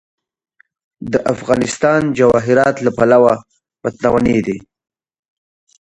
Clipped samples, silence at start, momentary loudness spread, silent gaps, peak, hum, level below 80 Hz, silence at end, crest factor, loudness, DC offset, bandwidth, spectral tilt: under 0.1%; 1 s; 13 LU; none; 0 dBFS; none; -44 dBFS; 1.25 s; 16 dB; -14 LUFS; under 0.1%; 11 kHz; -6 dB/octave